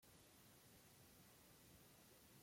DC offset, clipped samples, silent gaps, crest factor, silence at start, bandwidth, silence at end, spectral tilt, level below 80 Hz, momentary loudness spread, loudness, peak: under 0.1%; under 0.1%; none; 14 dB; 0 s; 16.5 kHz; 0 s; -3 dB/octave; -84 dBFS; 1 LU; -67 LUFS; -54 dBFS